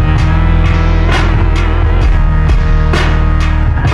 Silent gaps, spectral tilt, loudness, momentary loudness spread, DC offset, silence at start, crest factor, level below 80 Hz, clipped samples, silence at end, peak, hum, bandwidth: none; -7 dB/octave; -12 LUFS; 1 LU; under 0.1%; 0 s; 8 dB; -10 dBFS; under 0.1%; 0 s; 0 dBFS; none; 7.6 kHz